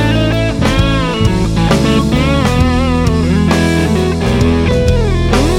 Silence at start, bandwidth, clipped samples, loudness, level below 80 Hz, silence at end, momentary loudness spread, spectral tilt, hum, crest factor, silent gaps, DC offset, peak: 0 s; 15.5 kHz; under 0.1%; -12 LUFS; -18 dBFS; 0 s; 2 LU; -6 dB/octave; none; 10 dB; none; under 0.1%; 0 dBFS